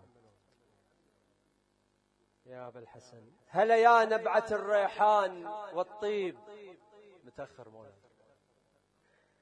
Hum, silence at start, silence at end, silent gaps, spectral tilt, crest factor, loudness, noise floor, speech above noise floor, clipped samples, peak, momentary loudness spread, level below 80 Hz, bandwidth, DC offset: 50 Hz at -75 dBFS; 2.5 s; 1.6 s; none; -4.5 dB/octave; 22 dB; -28 LUFS; -74 dBFS; 44 dB; under 0.1%; -10 dBFS; 25 LU; -78 dBFS; 10 kHz; under 0.1%